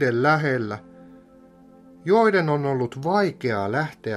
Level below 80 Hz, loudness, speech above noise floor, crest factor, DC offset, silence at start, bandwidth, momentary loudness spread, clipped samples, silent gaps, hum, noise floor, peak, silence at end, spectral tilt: -64 dBFS; -22 LUFS; 28 dB; 18 dB; under 0.1%; 0 s; 12 kHz; 10 LU; under 0.1%; none; none; -50 dBFS; -6 dBFS; 0 s; -7.5 dB/octave